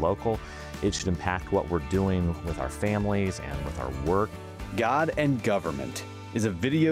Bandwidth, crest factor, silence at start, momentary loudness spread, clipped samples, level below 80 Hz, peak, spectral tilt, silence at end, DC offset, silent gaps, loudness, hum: 16 kHz; 18 dB; 0 s; 9 LU; under 0.1%; -42 dBFS; -10 dBFS; -6 dB/octave; 0 s; under 0.1%; none; -28 LUFS; none